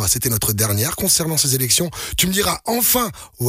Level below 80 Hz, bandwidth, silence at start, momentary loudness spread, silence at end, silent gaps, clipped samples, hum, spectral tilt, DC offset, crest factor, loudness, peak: -40 dBFS; 16 kHz; 0 s; 4 LU; 0 s; none; under 0.1%; none; -3 dB/octave; under 0.1%; 14 dB; -17 LUFS; -4 dBFS